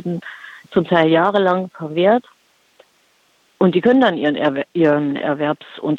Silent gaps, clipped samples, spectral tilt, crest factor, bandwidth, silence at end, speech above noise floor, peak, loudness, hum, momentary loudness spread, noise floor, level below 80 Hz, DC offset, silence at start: none; under 0.1%; -8 dB/octave; 16 dB; 7.8 kHz; 0 s; 42 dB; -2 dBFS; -17 LUFS; none; 11 LU; -59 dBFS; -62 dBFS; under 0.1%; 0.05 s